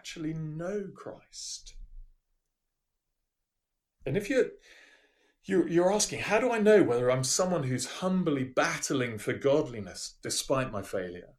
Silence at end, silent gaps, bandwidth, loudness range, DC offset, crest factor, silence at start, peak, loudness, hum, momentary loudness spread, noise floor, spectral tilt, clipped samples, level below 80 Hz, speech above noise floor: 0.15 s; none; 13.5 kHz; 15 LU; under 0.1%; 20 dB; 0.05 s; -10 dBFS; -29 LUFS; none; 14 LU; -85 dBFS; -4.5 dB/octave; under 0.1%; -56 dBFS; 56 dB